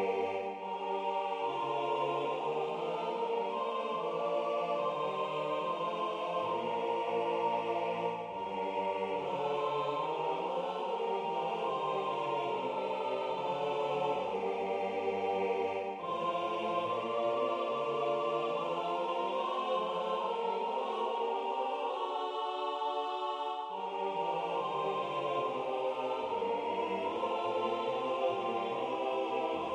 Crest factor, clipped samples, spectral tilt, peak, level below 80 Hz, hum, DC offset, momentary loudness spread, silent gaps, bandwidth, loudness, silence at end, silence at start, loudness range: 14 dB; under 0.1%; -5.5 dB/octave; -20 dBFS; -80 dBFS; none; under 0.1%; 3 LU; none; 10 kHz; -35 LUFS; 0 s; 0 s; 1 LU